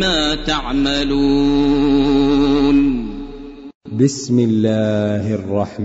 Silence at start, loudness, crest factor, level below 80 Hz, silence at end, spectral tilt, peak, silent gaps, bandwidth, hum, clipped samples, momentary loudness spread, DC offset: 0 s; -16 LUFS; 14 dB; -30 dBFS; 0 s; -5.5 dB/octave; -2 dBFS; 3.75-3.81 s; 8 kHz; none; under 0.1%; 14 LU; under 0.1%